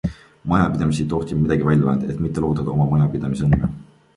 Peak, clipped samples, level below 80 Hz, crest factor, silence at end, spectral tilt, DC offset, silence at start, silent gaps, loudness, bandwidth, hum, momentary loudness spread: -4 dBFS; under 0.1%; -36 dBFS; 16 dB; 0.35 s; -8.5 dB/octave; under 0.1%; 0.05 s; none; -20 LUFS; 11.5 kHz; none; 7 LU